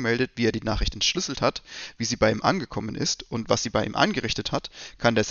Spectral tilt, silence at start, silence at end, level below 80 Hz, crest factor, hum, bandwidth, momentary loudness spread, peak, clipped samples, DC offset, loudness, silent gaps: -3.5 dB/octave; 0 s; 0 s; -40 dBFS; 22 dB; none; 7.4 kHz; 8 LU; -4 dBFS; under 0.1%; under 0.1%; -25 LUFS; none